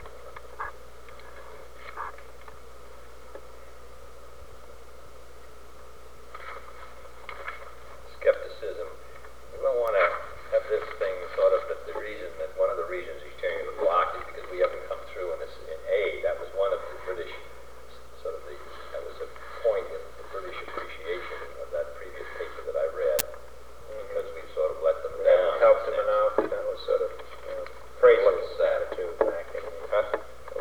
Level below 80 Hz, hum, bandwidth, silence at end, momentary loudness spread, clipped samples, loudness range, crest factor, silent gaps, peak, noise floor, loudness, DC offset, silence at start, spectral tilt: -54 dBFS; 60 Hz at -55 dBFS; over 20 kHz; 0 s; 24 LU; under 0.1%; 20 LU; 30 dB; none; 0 dBFS; -49 dBFS; -28 LUFS; 0.9%; 0 s; -3.5 dB/octave